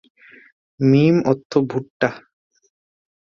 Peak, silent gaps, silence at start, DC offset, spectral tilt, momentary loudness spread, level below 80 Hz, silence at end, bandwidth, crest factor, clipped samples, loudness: -2 dBFS; 1.45-1.50 s, 1.90-2.00 s; 0.8 s; under 0.1%; -8 dB/octave; 9 LU; -60 dBFS; 1.05 s; 7 kHz; 18 dB; under 0.1%; -18 LUFS